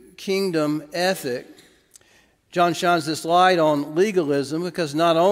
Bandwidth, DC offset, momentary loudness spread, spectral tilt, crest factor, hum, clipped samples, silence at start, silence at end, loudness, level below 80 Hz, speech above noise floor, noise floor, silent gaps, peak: 16 kHz; under 0.1%; 10 LU; -5 dB/octave; 18 dB; none; under 0.1%; 0.2 s; 0 s; -21 LUFS; -68 dBFS; 38 dB; -58 dBFS; none; -4 dBFS